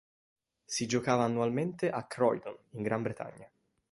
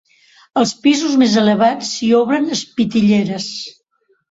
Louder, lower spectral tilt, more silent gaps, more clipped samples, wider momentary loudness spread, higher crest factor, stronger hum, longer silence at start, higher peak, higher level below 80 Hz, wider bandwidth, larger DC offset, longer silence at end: second, -32 LUFS vs -15 LUFS; about the same, -5 dB/octave vs -4.5 dB/octave; neither; neither; about the same, 11 LU vs 10 LU; first, 20 dB vs 14 dB; neither; first, 0.7 s vs 0.55 s; second, -12 dBFS vs -2 dBFS; second, -70 dBFS vs -56 dBFS; first, 11.5 kHz vs 8 kHz; neither; second, 0.45 s vs 0.6 s